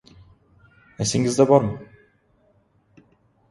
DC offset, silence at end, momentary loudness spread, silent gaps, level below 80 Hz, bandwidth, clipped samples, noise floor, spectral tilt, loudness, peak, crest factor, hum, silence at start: under 0.1%; 1.65 s; 13 LU; none; -54 dBFS; 11.5 kHz; under 0.1%; -62 dBFS; -5.5 dB/octave; -20 LUFS; 0 dBFS; 24 dB; none; 1 s